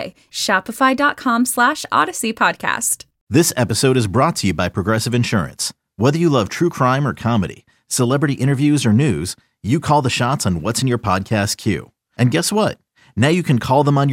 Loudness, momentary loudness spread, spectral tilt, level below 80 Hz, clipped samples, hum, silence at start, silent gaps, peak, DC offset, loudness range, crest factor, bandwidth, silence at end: -17 LUFS; 8 LU; -5 dB/octave; -48 dBFS; under 0.1%; none; 0 s; 3.21-3.27 s; -2 dBFS; under 0.1%; 2 LU; 16 dB; 17 kHz; 0 s